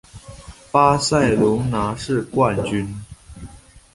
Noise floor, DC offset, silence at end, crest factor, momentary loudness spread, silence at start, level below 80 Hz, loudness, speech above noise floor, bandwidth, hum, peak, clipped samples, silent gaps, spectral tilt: -42 dBFS; under 0.1%; 0.15 s; 18 dB; 24 LU; 0.15 s; -42 dBFS; -19 LUFS; 24 dB; 11.5 kHz; none; -2 dBFS; under 0.1%; none; -5.5 dB/octave